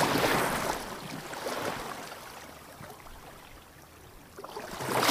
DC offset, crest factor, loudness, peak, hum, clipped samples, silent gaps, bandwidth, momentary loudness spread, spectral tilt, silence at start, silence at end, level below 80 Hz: under 0.1%; 24 dB; -32 LUFS; -10 dBFS; none; under 0.1%; none; 15.5 kHz; 23 LU; -3 dB/octave; 0 s; 0 s; -56 dBFS